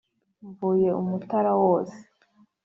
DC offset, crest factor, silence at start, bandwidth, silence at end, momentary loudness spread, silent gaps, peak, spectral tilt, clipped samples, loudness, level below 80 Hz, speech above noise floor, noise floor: under 0.1%; 16 dB; 0.45 s; 7.2 kHz; 0.65 s; 8 LU; none; -10 dBFS; -10 dB/octave; under 0.1%; -24 LUFS; -68 dBFS; 38 dB; -62 dBFS